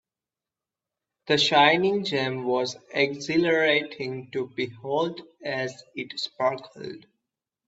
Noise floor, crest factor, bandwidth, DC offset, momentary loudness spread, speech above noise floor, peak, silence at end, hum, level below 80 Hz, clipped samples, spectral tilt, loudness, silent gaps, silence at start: under -90 dBFS; 22 dB; 8 kHz; under 0.1%; 17 LU; over 65 dB; -4 dBFS; 0.7 s; none; -70 dBFS; under 0.1%; -4.5 dB/octave; -25 LUFS; none; 1.25 s